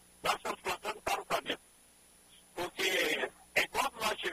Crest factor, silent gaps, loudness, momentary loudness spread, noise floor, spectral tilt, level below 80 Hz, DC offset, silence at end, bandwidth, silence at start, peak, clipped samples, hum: 20 dB; none; -34 LUFS; 10 LU; -62 dBFS; -1.5 dB/octave; -64 dBFS; under 0.1%; 0 s; 15.5 kHz; 0.25 s; -16 dBFS; under 0.1%; 60 Hz at -70 dBFS